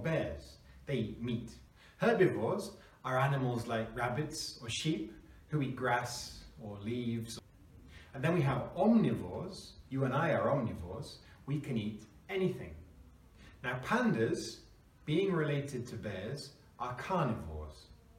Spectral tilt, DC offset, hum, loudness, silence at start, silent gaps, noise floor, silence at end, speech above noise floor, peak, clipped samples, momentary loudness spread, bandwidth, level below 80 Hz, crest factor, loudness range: -6 dB/octave; under 0.1%; none; -35 LUFS; 0 s; none; -58 dBFS; 0.05 s; 24 dB; -16 dBFS; under 0.1%; 18 LU; 16 kHz; -58 dBFS; 20 dB; 4 LU